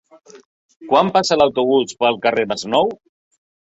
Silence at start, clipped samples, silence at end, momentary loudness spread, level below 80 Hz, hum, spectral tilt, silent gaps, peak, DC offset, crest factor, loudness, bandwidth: 0.35 s; under 0.1%; 0.85 s; 6 LU; -58 dBFS; none; -4 dB/octave; 0.45-0.69 s, 0.76-0.80 s; -2 dBFS; under 0.1%; 18 dB; -17 LUFS; 8.2 kHz